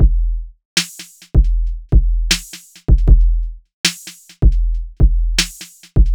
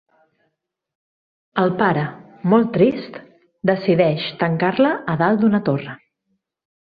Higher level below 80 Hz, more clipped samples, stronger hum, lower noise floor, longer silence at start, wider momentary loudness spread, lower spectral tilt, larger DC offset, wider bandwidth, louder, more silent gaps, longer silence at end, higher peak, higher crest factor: first, -14 dBFS vs -60 dBFS; neither; neither; second, -37 dBFS vs -74 dBFS; second, 0 s vs 1.55 s; first, 15 LU vs 11 LU; second, -3.5 dB/octave vs -10 dB/octave; neither; first, 16.5 kHz vs 5 kHz; about the same, -18 LUFS vs -19 LUFS; first, 0.65-0.76 s, 3.73-3.84 s vs none; second, 0 s vs 0.95 s; about the same, 0 dBFS vs -2 dBFS; about the same, 14 dB vs 18 dB